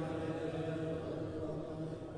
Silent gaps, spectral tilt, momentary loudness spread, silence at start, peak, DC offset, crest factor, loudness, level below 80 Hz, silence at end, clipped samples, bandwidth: none; -8 dB/octave; 3 LU; 0 s; -28 dBFS; under 0.1%; 12 dB; -41 LUFS; -60 dBFS; 0 s; under 0.1%; 10.5 kHz